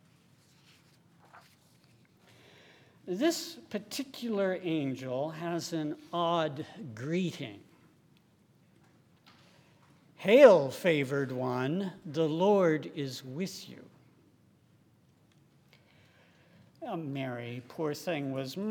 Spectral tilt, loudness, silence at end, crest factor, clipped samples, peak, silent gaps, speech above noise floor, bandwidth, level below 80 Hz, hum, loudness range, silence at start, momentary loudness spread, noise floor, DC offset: -5.5 dB/octave; -30 LUFS; 0 s; 26 dB; under 0.1%; -6 dBFS; none; 35 dB; 18.5 kHz; -82 dBFS; none; 17 LU; 1.35 s; 15 LU; -65 dBFS; under 0.1%